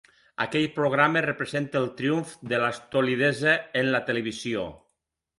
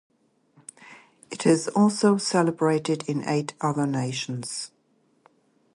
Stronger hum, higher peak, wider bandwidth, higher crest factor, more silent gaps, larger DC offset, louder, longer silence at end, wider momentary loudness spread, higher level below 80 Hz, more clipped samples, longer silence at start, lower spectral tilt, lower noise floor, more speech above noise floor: neither; about the same, -6 dBFS vs -8 dBFS; about the same, 11.5 kHz vs 11.5 kHz; about the same, 22 dB vs 18 dB; neither; neither; about the same, -25 LUFS vs -24 LUFS; second, 0.65 s vs 1.05 s; second, 9 LU vs 15 LU; first, -64 dBFS vs -70 dBFS; neither; second, 0.4 s vs 0.8 s; about the same, -5.5 dB/octave vs -5.5 dB/octave; first, -79 dBFS vs -66 dBFS; first, 53 dB vs 42 dB